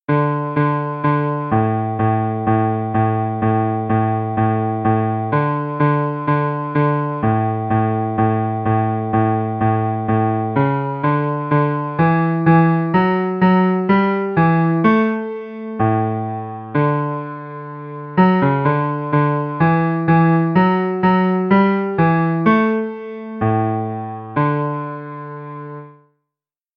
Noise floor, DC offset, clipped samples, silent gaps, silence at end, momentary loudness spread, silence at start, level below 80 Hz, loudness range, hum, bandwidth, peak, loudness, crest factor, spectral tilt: -85 dBFS; under 0.1%; under 0.1%; none; 0.85 s; 11 LU; 0.1 s; -50 dBFS; 4 LU; none; 5 kHz; 0 dBFS; -17 LUFS; 16 dB; -11.5 dB/octave